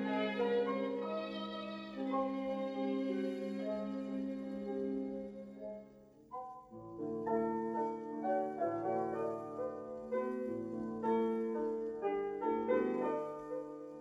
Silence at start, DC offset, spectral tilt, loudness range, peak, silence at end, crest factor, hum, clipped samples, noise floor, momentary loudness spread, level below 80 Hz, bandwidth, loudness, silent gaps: 0 s; under 0.1%; -7.5 dB/octave; 5 LU; -20 dBFS; 0 s; 18 dB; none; under 0.1%; -59 dBFS; 13 LU; -74 dBFS; 9.6 kHz; -39 LUFS; none